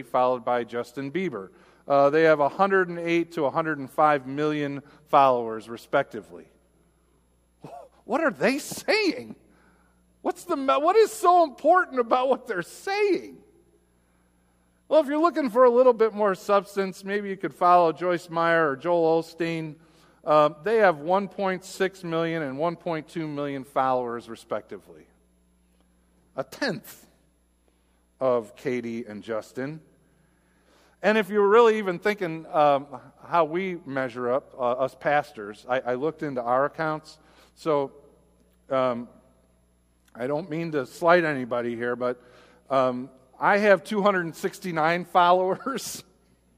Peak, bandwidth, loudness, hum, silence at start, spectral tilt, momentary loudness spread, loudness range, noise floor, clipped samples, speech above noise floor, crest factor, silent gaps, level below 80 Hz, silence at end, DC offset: -4 dBFS; 15.5 kHz; -24 LUFS; none; 0 s; -5.5 dB/octave; 15 LU; 9 LU; -65 dBFS; under 0.1%; 41 dB; 22 dB; none; -68 dBFS; 0.55 s; under 0.1%